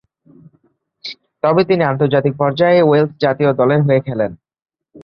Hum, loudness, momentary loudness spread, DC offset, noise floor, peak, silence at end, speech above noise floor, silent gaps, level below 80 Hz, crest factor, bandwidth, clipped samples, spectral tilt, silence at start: none; -15 LUFS; 15 LU; under 0.1%; -60 dBFS; -2 dBFS; 0.05 s; 46 dB; none; -56 dBFS; 14 dB; 6.2 kHz; under 0.1%; -9 dB/octave; 1.05 s